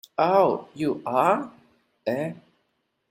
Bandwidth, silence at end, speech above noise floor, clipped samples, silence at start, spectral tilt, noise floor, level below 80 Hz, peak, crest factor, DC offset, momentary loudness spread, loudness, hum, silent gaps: 16 kHz; 0.75 s; 51 dB; under 0.1%; 0.2 s; -7 dB/octave; -74 dBFS; -70 dBFS; -6 dBFS; 18 dB; under 0.1%; 14 LU; -24 LUFS; none; none